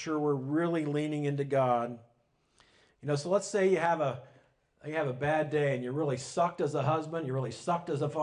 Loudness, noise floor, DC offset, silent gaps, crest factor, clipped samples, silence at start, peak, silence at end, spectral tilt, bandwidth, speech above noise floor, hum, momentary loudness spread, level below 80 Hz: -31 LUFS; -71 dBFS; under 0.1%; none; 16 dB; under 0.1%; 0 s; -14 dBFS; 0 s; -6.5 dB/octave; 10.5 kHz; 41 dB; none; 7 LU; -70 dBFS